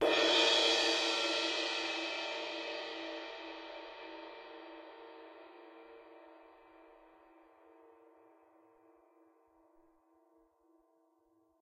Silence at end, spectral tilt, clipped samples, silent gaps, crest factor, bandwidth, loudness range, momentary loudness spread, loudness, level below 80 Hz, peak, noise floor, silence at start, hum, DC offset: 4.8 s; 0 dB/octave; under 0.1%; none; 22 dB; 15 kHz; 27 LU; 28 LU; -32 LUFS; -80 dBFS; -18 dBFS; -73 dBFS; 0 s; none; under 0.1%